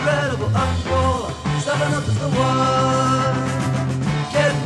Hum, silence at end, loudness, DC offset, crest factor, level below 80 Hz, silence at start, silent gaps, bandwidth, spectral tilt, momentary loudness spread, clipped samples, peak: none; 0 s; -20 LUFS; under 0.1%; 14 dB; -38 dBFS; 0 s; none; 12 kHz; -5.5 dB/octave; 4 LU; under 0.1%; -6 dBFS